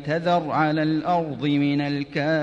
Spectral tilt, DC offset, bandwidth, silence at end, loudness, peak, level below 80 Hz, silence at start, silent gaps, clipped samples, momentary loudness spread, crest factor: -7.5 dB/octave; under 0.1%; 7.6 kHz; 0 s; -23 LUFS; -10 dBFS; -58 dBFS; 0 s; none; under 0.1%; 3 LU; 12 dB